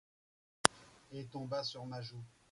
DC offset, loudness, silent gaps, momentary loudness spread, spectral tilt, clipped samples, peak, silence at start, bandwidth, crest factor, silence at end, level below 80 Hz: under 0.1%; -37 LUFS; none; 18 LU; -2.5 dB/octave; under 0.1%; -2 dBFS; 0.65 s; 11.5 kHz; 40 dB; 0.25 s; -72 dBFS